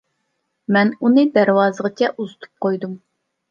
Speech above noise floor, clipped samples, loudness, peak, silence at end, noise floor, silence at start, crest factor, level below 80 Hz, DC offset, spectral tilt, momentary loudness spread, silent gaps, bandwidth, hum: 55 dB; under 0.1%; -17 LUFS; -2 dBFS; 0.55 s; -72 dBFS; 0.7 s; 18 dB; -72 dBFS; under 0.1%; -7 dB/octave; 17 LU; none; 7.2 kHz; none